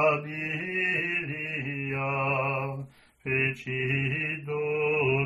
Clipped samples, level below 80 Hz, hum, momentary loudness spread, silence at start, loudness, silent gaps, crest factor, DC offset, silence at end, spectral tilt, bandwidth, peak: under 0.1%; -62 dBFS; none; 6 LU; 0 s; -28 LUFS; none; 18 dB; under 0.1%; 0 s; -7.5 dB/octave; 10.5 kHz; -12 dBFS